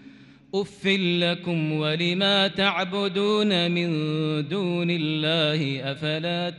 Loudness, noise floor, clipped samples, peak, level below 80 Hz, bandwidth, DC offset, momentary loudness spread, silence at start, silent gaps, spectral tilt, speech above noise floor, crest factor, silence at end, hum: -24 LUFS; -49 dBFS; under 0.1%; -8 dBFS; -66 dBFS; 10 kHz; under 0.1%; 7 LU; 0.05 s; none; -6 dB/octave; 25 dB; 18 dB; 0 s; none